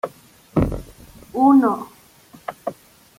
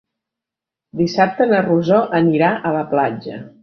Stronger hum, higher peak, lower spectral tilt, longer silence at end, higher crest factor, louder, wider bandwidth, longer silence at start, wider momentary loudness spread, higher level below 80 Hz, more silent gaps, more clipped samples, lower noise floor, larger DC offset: neither; about the same, -4 dBFS vs -2 dBFS; about the same, -8.5 dB/octave vs -7.5 dB/octave; first, 0.45 s vs 0.15 s; about the same, 18 dB vs 16 dB; second, -19 LUFS vs -16 LUFS; first, 15.5 kHz vs 6.6 kHz; second, 0.05 s vs 0.95 s; first, 21 LU vs 10 LU; first, -40 dBFS vs -60 dBFS; neither; neither; second, -48 dBFS vs -86 dBFS; neither